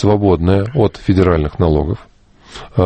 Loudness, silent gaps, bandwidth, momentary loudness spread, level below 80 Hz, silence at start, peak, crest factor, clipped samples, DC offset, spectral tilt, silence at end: -15 LUFS; none; 8.6 kHz; 10 LU; -28 dBFS; 0 s; 0 dBFS; 14 dB; under 0.1%; under 0.1%; -9 dB/octave; 0 s